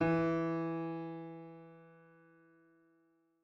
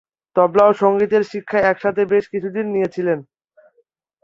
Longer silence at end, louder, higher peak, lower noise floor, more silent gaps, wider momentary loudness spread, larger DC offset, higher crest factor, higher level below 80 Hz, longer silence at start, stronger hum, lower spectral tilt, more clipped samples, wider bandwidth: first, 1.5 s vs 1 s; second, -37 LUFS vs -18 LUFS; second, -22 dBFS vs -2 dBFS; first, -74 dBFS vs -63 dBFS; neither; first, 23 LU vs 9 LU; neither; about the same, 18 dB vs 16 dB; second, -68 dBFS vs -58 dBFS; second, 0 s vs 0.35 s; neither; first, -9 dB/octave vs -7.5 dB/octave; neither; second, 6 kHz vs 7.4 kHz